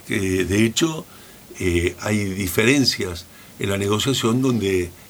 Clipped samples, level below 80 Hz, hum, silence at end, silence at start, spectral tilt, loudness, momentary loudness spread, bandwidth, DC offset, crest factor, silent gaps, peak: under 0.1%; -44 dBFS; none; 0 s; 0.05 s; -4.5 dB/octave; -20 LUFS; 12 LU; over 20 kHz; under 0.1%; 20 dB; none; -2 dBFS